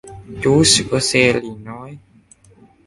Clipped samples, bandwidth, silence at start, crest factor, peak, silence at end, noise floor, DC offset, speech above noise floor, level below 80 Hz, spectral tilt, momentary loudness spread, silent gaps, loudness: under 0.1%; 11.5 kHz; 0.05 s; 18 dB; 0 dBFS; 0.9 s; -49 dBFS; under 0.1%; 33 dB; -44 dBFS; -3.5 dB/octave; 22 LU; none; -14 LUFS